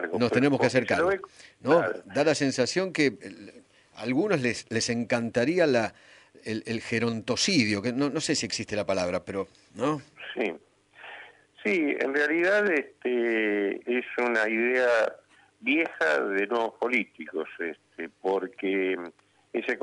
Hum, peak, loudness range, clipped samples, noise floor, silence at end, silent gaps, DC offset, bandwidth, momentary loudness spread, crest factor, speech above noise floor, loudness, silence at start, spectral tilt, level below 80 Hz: none; -8 dBFS; 5 LU; under 0.1%; -49 dBFS; 0 s; none; under 0.1%; 11 kHz; 12 LU; 18 dB; 22 dB; -27 LUFS; 0 s; -4.5 dB/octave; -66 dBFS